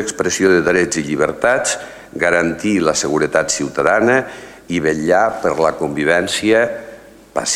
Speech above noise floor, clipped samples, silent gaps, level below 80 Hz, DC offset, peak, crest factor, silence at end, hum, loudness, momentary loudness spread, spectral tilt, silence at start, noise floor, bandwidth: 23 dB; under 0.1%; none; -48 dBFS; under 0.1%; 0 dBFS; 16 dB; 0 s; none; -16 LUFS; 9 LU; -3.5 dB/octave; 0 s; -38 dBFS; 16 kHz